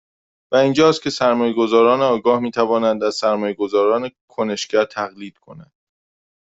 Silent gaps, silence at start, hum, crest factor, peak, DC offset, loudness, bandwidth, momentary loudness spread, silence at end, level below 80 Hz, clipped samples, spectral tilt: 4.21-4.28 s; 0.5 s; none; 16 dB; -2 dBFS; under 0.1%; -18 LUFS; 8 kHz; 11 LU; 0.95 s; -60 dBFS; under 0.1%; -5 dB/octave